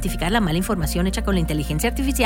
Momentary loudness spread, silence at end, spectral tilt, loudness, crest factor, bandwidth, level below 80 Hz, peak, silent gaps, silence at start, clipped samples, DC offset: 2 LU; 0 s; -5 dB/octave; -22 LUFS; 14 dB; 17.5 kHz; -26 dBFS; -6 dBFS; none; 0 s; under 0.1%; under 0.1%